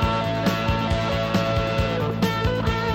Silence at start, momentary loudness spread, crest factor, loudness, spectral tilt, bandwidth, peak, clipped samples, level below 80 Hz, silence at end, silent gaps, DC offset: 0 s; 1 LU; 14 dB; -23 LUFS; -6 dB/octave; 16.5 kHz; -8 dBFS; under 0.1%; -32 dBFS; 0 s; none; under 0.1%